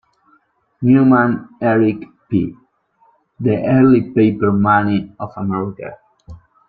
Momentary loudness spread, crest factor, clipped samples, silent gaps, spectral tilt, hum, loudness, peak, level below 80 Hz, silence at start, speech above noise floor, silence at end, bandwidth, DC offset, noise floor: 15 LU; 14 dB; under 0.1%; none; -11.5 dB/octave; none; -15 LUFS; -2 dBFS; -50 dBFS; 0.8 s; 43 dB; 0.3 s; 4.6 kHz; under 0.1%; -58 dBFS